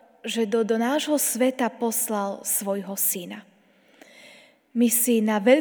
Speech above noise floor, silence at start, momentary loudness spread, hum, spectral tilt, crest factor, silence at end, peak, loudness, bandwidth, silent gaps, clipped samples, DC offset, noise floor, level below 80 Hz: 35 dB; 0.25 s; 10 LU; none; -3 dB/octave; 20 dB; 0 s; -4 dBFS; -23 LUFS; over 20 kHz; none; under 0.1%; under 0.1%; -58 dBFS; -82 dBFS